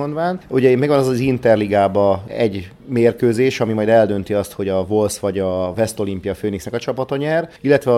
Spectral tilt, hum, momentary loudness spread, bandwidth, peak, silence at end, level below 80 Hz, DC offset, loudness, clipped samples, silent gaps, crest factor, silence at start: -6.5 dB/octave; none; 8 LU; 15.5 kHz; 0 dBFS; 0 s; -50 dBFS; under 0.1%; -18 LUFS; under 0.1%; none; 16 dB; 0 s